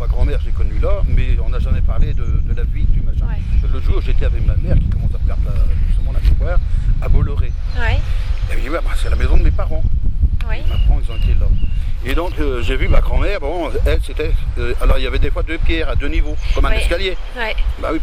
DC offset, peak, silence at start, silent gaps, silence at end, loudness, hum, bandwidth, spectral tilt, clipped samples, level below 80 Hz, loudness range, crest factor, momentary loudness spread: under 0.1%; 0 dBFS; 0 s; none; 0 s; -20 LUFS; none; 9.6 kHz; -7 dB/octave; under 0.1%; -14 dBFS; 1 LU; 14 dB; 4 LU